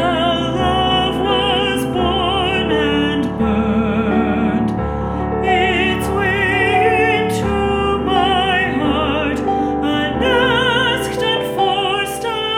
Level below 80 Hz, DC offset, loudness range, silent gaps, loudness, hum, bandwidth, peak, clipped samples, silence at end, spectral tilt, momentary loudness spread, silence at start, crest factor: -32 dBFS; under 0.1%; 2 LU; none; -16 LUFS; none; 17 kHz; -2 dBFS; under 0.1%; 0 s; -5.5 dB/octave; 4 LU; 0 s; 14 dB